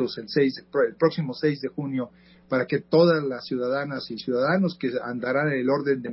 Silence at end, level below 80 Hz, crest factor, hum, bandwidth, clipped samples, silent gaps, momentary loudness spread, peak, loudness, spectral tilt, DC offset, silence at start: 0 s; -66 dBFS; 18 dB; none; 5.8 kHz; under 0.1%; none; 9 LU; -8 dBFS; -25 LUFS; -10.5 dB/octave; under 0.1%; 0 s